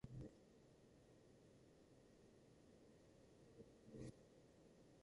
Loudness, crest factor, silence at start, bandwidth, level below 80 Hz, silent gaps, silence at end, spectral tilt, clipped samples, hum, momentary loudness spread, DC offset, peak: -63 LUFS; 22 dB; 0 s; 11 kHz; -76 dBFS; none; 0 s; -7 dB/octave; under 0.1%; none; 11 LU; under 0.1%; -42 dBFS